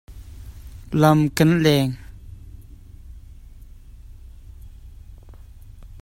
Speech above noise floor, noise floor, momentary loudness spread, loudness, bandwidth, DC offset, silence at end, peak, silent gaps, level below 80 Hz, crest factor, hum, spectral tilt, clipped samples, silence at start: 25 dB; -42 dBFS; 27 LU; -18 LUFS; 16 kHz; under 0.1%; 0.05 s; 0 dBFS; none; -42 dBFS; 24 dB; none; -6.5 dB/octave; under 0.1%; 0.1 s